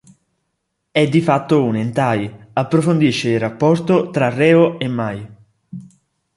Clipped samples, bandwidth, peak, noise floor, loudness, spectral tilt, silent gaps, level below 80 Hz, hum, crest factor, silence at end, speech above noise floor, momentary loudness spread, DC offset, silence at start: under 0.1%; 11.5 kHz; -2 dBFS; -73 dBFS; -16 LUFS; -7 dB/octave; none; -56 dBFS; none; 16 dB; 0.55 s; 57 dB; 13 LU; under 0.1%; 0.95 s